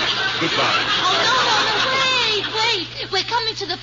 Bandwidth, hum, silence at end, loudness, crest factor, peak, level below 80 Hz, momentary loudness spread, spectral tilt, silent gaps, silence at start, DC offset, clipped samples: 7.6 kHz; none; 0 s; -17 LUFS; 14 dB; -6 dBFS; -50 dBFS; 6 LU; -2 dB/octave; none; 0 s; under 0.1%; under 0.1%